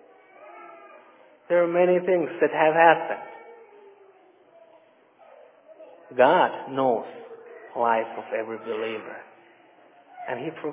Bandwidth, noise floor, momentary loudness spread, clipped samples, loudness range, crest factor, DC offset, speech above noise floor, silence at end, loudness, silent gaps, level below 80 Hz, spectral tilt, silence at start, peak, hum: 3.8 kHz; -57 dBFS; 25 LU; under 0.1%; 8 LU; 22 dB; under 0.1%; 34 dB; 0 s; -23 LUFS; none; -86 dBFS; -9 dB/octave; 0.4 s; -4 dBFS; none